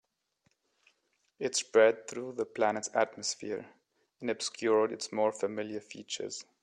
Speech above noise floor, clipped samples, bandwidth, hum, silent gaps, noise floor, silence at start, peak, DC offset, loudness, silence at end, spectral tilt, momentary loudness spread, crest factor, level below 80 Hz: 45 dB; under 0.1%; 10.5 kHz; none; none; -76 dBFS; 1.4 s; -12 dBFS; under 0.1%; -32 LUFS; 0.2 s; -2.5 dB/octave; 14 LU; 22 dB; -82 dBFS